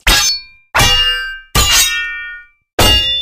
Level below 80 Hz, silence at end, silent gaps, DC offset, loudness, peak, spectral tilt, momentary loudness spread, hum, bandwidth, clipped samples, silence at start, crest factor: -22 dBFS; 0 s; 2.73-2.78 s; under 0.1%; -11 LUFS; 0 dBFS; -1 dB/octave; 13 LU; none; 15.5 kHz; under 0.1%; 0.05 s; 14 dB